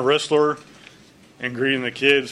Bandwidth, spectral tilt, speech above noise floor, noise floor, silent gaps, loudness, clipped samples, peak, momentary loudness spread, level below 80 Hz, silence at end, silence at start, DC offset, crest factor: 11.5 kHz; -4 dB/octave; 30 dB; -50 dBFS; none; -20 LUFS; under 0.1%; -2 dBFS; 12 LU; -64 dBFS; 0 s; 0 s; under 0.1%; 20 dB